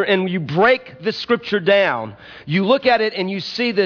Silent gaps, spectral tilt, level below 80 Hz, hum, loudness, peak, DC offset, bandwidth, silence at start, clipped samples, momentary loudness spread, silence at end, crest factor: none; -6.5 dB/octave; -56 dBFS; none; -18 LUFS; -4 dBFS; under 0.1%; 5.4 kHz; 0 s; under 0.1%; 10 LU; 0 s; 14 dB